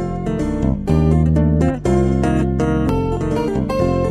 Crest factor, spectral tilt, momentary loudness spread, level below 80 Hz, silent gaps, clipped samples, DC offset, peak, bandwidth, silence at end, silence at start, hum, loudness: 14 dB; -8.5 dB/octave; 5 LU; -24 dBFS; none; under 0.1%; under 0.1%; -4 dBFS; 11.5 kHz; 0 s; 0 s; none; -17 LUFS